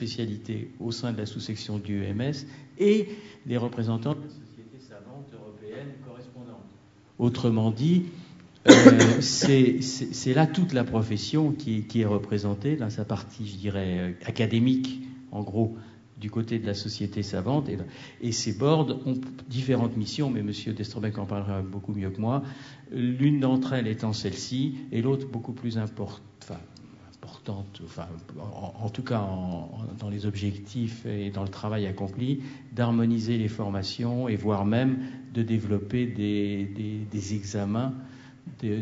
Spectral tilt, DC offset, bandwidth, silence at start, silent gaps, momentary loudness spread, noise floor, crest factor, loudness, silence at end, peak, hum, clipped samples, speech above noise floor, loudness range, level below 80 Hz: -6 dB/octave; under 0.1%; 8 kHz; 0 s; none; 17 LU; -55 dBFS; 26 dB; -26 LUFS; 0 s; 0 dBFS; none; under 0.1%; 29 dB; 15 LU; -62 dBFS